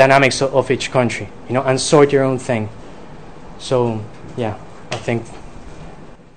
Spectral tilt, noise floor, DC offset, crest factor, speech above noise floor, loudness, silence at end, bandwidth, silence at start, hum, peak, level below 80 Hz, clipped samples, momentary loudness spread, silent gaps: -5 dB/octave; -39 dBFS; 1%; 18 dB; 22 dB; -17 LUFS; 0.1 s; 12 kHz; 0 s; none; 0 dBFS; -46 dBFS; 0.1%; 25 LU; none